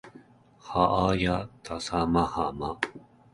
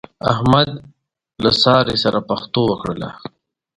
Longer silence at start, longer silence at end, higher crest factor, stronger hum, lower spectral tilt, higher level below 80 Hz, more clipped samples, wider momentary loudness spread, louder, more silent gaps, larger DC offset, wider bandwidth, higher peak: second, 0.05 s vs 0.25 s; second, 0.35 s vs 0.5 s; about the same, 22 dB vs 18 dB; neither; about the same, -6 dB/octave vs -6 dB/octave; about the same, -46 dBFS vs -46 dBFS; neither; second, 10 LU vs 18 LU; second, -28 LUFS vs -17 LUFS; neither; neither; about the same, 11.5 kHz vs 11 kHz; second, -6 dBFS vs 0 dBFS